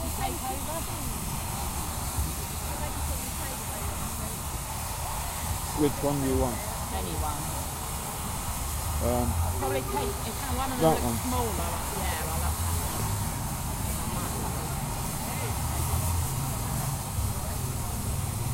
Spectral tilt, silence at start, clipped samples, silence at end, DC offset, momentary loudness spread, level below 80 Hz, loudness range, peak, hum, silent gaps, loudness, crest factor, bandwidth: -4.5 dB/octave; 0 s; under 0.1%; 0 s; under 0.1%; 5 LU; -36 dBFS; 3 LU; -10 dBFS; none; none; -30 LUFS; 20 dB; 16 kHz